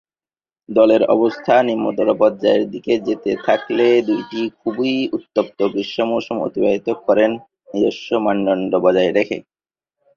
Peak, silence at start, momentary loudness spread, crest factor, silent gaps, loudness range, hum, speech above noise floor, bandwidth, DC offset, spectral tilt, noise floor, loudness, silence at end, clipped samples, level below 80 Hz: -2 dBFS; 0.7 s; 7 LU; 16 dB; none; 3 LU; none; over 73 dB; 7 kHz; under 0.1%; -6.5 dB/octave; under -90 dBFS; -18 LUFS; 0.75 s; under 0.1%; -60 dBFS